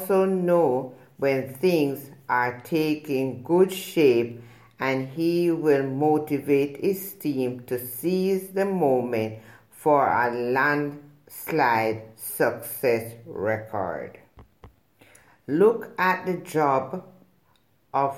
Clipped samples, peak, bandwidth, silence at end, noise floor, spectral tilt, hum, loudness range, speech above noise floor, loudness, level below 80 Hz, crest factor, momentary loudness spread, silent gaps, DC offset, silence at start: under 0.1%; -8 dBFS; 17 kHz; 0 s; -65 dBFS; -6 dB/octave; none; 3 LU; 41 dB; -24 LUFS; -68 dBFS; 18 dB; 12 LU; none; under 0.1%; 0 s